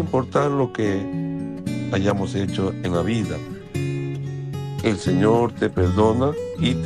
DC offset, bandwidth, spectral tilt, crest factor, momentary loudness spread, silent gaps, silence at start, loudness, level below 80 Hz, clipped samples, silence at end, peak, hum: under 0.1%; 13 kHz; -7 dB/octave; 18 dB; 10 LU; none; 0 s; -23 LUFS; -46 dBFS; under 0.1%; 0 s; -4 dBFS; none